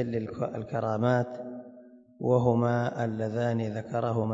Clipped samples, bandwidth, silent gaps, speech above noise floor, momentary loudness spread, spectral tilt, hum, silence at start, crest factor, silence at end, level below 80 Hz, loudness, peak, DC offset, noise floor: under 0.1%; 7.6 kHz; none; 24 dB; 10 LU; -8.5 dB/octave; none; 0 s; 20 dB; 0 s; -64 dBFS; -29 LUFS; -10 dBFS; under 0.1%; -52 dBFS